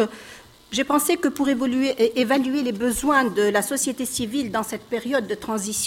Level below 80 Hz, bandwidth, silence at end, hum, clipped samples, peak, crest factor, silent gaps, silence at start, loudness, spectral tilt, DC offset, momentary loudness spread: -52 dBFS; 17 kHz; 0 s; none; under 0.1%; -6 dBFS; 16 dB; none; 0 s; -22 LUFS; -3 dB/octave; under 0.1%; 8 LU